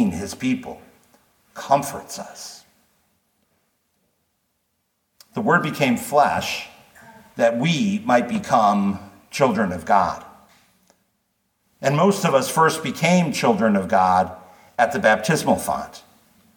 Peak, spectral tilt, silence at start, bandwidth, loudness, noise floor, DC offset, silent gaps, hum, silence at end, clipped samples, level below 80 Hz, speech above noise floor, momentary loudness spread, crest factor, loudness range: -2 dBFS; -5 dB/octave; 0 s; 19 kHz; -20 LUFS; -72 dBFS; under 0.1%; none; none; 0.55 s; under 0.1%; -58 dBFS; 52 dB; 16 LU; 20 dB; 10 LU